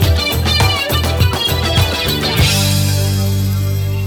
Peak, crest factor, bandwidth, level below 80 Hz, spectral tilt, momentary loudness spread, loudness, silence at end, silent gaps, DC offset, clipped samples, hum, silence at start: 0 dBFS; 14 dB; over 20 kHz; -24 dBFS; -4 dB/octave; 4 LU; -14 LUFS; 0 s; none; under 0.1%; under 0.1%; 50 Hz at -30 dBFS; 0 s